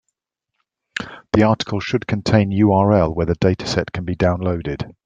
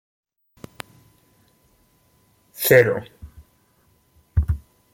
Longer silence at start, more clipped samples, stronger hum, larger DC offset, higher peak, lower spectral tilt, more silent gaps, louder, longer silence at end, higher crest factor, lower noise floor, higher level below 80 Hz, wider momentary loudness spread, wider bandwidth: second, 0.95 s vs 2.6 s; neither; neither; neither; about the same, -2 dBFS vs -2 dBFS; first, -7 dB/octave vs -5 dB/octave; neither; about the same, -18 LUFS vs -20 LUFS; second, 0.15 s vs 0.35 s; second, 18 dB vs 24 dB; first, -79 dBFS vs -61 dBFS; about the same, -42 dBFS vs -38 dBFS; second, 13 LU vs 26 LU; second, 9 kHz vs 16.5 kHz